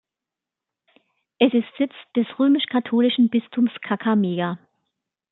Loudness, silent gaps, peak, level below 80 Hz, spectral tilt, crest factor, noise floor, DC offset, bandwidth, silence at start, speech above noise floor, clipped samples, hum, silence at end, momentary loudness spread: -21 LUFS; none; -2 dBFS; -74 dBFS; -10 dB/octave; 20 dB; -87 dBFS; under 0.1%; 4.1 kHz; 1.4 s; 67 dB; under 0.1%; none; 0.75 s; 8 LU